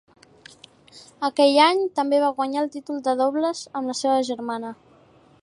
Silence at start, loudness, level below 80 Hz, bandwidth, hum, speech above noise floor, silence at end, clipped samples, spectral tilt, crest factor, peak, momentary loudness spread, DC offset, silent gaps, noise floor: 0.95 s; -22 LUFS; -74 dBFS; 11.5 kHz; none; 33 dB; 0.7 s; under 0.1%; -3 dB/octave; 20 dB; -4 dBFS; 12 LU; under 0.1%; none; -54 dBFS